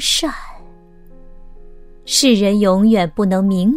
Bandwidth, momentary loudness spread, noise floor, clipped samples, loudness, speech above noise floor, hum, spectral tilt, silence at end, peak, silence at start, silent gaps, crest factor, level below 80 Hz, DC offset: 16 kHz; 6 LU; -40 dBFS; under 0.1%; -14 LUFS; 26 dB; none; -4.5 dB/octave; 0 s; 0 dBFS; 0 s; none; 16 dB; -38 dBFS; under 0.1%